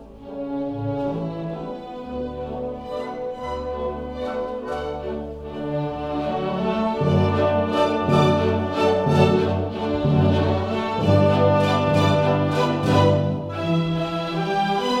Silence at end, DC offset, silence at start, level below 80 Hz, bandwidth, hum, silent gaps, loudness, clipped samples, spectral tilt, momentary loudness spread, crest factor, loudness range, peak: 0 s; under 0.1%; 0 s; -44 dBFS; 11.5 kHz; none; none; -22 LUFS; under 0.1%; -7.5 dB/octave; 12 LU; 16 dB; 10 LU; -4 dBFS